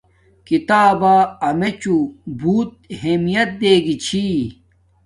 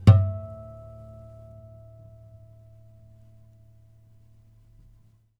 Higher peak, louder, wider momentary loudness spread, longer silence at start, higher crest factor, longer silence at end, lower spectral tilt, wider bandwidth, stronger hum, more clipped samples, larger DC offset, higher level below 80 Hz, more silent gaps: about the same, -2 dBFS vs -2 dBFS; first, -17 LUFS vs -24 LUFS; second, 10 LU vs 28 LU; first, 0.5 s vs 0.05 s; second, 16 dB vs 26 dB; second, 0.55 s vs 4.85 s; second, -5.5 dB/octave vs -9 dB/octave; first, 11.5 kHz vs 5.6 kHz; neither; neither; neither; about the same, -50 dBFS vs -48 dBFS; neither